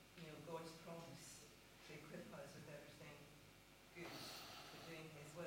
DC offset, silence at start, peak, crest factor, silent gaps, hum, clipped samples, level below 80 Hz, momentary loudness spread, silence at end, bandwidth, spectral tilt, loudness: under 0.1%; 0 s; -40 dBFS; 18 dB; none; none; under 0.1%; -78 dBFS; 9 LU; 0 s; 16.5 kHz; -4 dB/octave; -57 LUFS